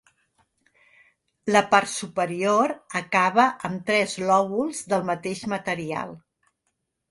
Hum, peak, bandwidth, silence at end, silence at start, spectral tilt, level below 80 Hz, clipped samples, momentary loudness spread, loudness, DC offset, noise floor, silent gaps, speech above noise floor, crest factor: none; -2 dBFS; 11.5 kHz; 0.95 s; 1.45 s; -4 dB/octave; -68 dBFS; under 0.1%; 11 LU; -23 LUFS; under 0.1%; -77 dBFS; none; 54 dB; 22 dB